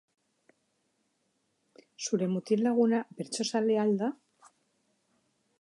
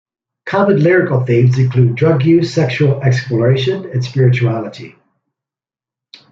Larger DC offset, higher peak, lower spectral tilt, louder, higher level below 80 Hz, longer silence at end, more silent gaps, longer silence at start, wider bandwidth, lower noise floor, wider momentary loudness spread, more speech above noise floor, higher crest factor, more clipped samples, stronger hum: neither; second, -14 dBFS vs -2 dBFS; second, -5 dB/octave vs -8 dB/octave; second, -29 LUFS vs -13 LUFS; second, -84 dBFS vs -52 dBFS; about the same, 1.45 s vs 1.45 s; neither; first, 2 s vs 0.45 s; first, 11.5 kHz vs 7.4 kHz; second, -76 dBFS vs -89 dBFS; first, 11 LU vs 8 LU; second, 48 dB vs 76 dB; first, 18 dB vs 12 dB; neither; neither